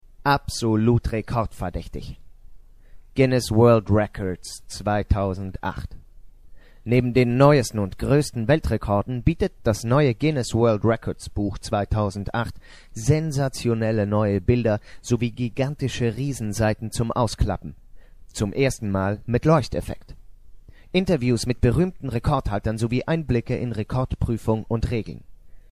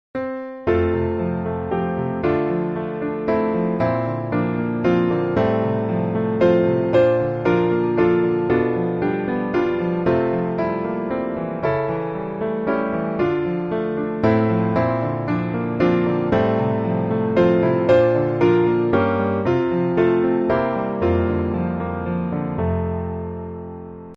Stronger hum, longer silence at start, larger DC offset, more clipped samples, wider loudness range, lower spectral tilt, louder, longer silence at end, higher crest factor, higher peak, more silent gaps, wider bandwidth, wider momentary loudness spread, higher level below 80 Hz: neither; about the same, 0.2 s vs 0.15 s; neither; neither; about the same, 4 LU vs 5 LU; second, -6.5 dB/octave vs -9.5 dB/octave; second, -23 LUFS vs -20 LUFS; first, 0.15 s vs 0 s; first, 22 dB vs 16 dB; first, 0 dBFS vs -4 dBFS; neither; first, 14.5 kHz vs 6 kHz; first, 11 LU vs 8 LU; first, -36 dBFS vs -44 dBFS